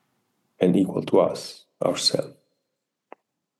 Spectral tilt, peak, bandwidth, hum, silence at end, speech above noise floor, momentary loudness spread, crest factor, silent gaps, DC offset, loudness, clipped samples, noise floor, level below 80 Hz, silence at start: -5 dB/octave; -6 dBFS; 12.5 kHz; none; 1.3 s; 58 dB; 14 LU; 20 dB; none; under 0.1%; -23 LUFS; under 0.1%; -80 dBFS; -70 dBFS; 0.6 s